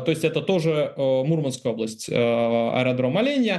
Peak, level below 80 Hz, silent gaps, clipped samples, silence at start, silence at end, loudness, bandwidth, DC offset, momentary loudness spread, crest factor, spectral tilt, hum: -6 dBFS; -66 dBFS; none; under 0.1%; 0 s; 0 s; -23 LUFS; 12.5 kHz; under 0.1%; 5 LU; 16 dB; -6 dB/octave; none